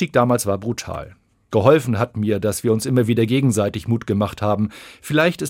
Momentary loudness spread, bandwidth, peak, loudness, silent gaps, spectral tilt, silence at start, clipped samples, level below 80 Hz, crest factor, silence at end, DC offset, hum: 10 LU; 16.5 kHz; 0 dBFS; -19 LUFS; none; -6 dB/octave; 0 s; under 0.1%; -52 dBFS; 18 dB; 0 s; under 0.1%; none